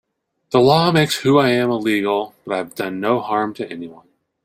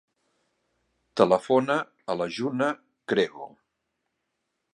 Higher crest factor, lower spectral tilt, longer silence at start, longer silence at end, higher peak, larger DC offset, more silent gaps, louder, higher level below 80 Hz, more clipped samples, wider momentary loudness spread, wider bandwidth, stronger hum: second, 16 dB vs 24 dB; about the same, -5.5 dB/octave vs -5.5 dB/octave; second, 0.5 s vs 1.15 s; second, 0.5 s vs 1.25 s; about the same, -2 dBFS vs -4 dBFS; neither; neither; first, -18 LUFS vs -26 LUFS; first, -58 dBFS vs -70 dBFS; neither; about the same, 13 LU vs 14 LU; first, 16 kHz vs 11 kHz; neither